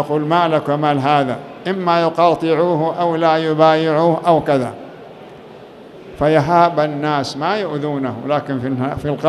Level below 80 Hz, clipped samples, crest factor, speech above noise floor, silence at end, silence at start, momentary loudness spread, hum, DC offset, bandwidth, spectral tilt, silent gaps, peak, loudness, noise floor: -50 dBFS; under 0.1%; 16 dB; 22 dB; 0 s; 0 s; 9 LU; none; under 0.1%; 12.5 kHz; -7 dB/octave; none; 0 dBFS; -16 LUFS; -38 dBFS